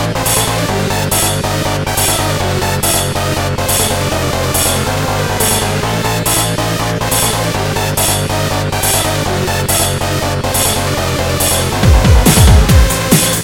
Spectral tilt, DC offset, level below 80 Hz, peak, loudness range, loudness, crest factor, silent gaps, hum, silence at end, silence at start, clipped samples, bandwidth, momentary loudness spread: -3.5 dB/octave; 0.2%; -20 dBFS; 0 dBFS; 3 LU; -12 LUFS; 12 dB; none; none; 0 s; 0 s; 0.2%; 17.5 kHz; 6 LU